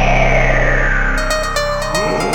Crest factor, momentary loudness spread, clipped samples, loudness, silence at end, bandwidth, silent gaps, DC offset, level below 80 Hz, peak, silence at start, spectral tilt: 14 dB; 5 LU; under 0.1%; -15 LUFS; 0 s; 16 kHz; none; under 0.1%; -18 dBFS; 0 dBFS; 0 s; -4.5 dB/octave